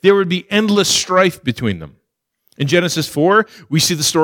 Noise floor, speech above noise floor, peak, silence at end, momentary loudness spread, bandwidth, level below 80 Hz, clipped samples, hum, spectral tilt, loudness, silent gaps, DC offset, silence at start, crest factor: -65 dBFS; 50 dB; -2 dBFS; 0 s; 8 LU; 18.5 kHz; -52 dBFS; under 0.1%; none; -4 dB/octave; -15 LUFS; none; under 0.1%; 0.05 s; 14 dB